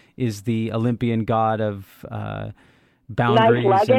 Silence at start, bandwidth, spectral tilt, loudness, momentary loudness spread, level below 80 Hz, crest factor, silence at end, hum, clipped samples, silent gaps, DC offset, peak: 0.2 s; 13.5 kHz; -7.5 dB/octave; -21 LUFS; 17 LU; -54 dBFS; 16 dB; 0 s; none; under 0.1%; none; under 0.1%; -4 dBFS